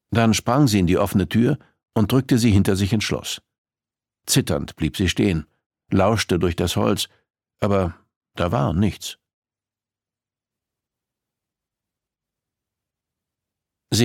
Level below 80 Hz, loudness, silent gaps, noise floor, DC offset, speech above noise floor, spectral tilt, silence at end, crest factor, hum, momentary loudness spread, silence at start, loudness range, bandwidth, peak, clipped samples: -44 dBFS; -21 LUFS; 3.58-3.65 s, 5.66-5.70 s, 8.16-8.21 s, 9.33-9.42 s; under -90 dBFS; under 0.1%; over 71 dB; -5.5 dB/octave; 0 s; 20 dB; none; 11 LU; 0.1 s; 8 LU; 17 kHz; -4 dBFS; under 0.1%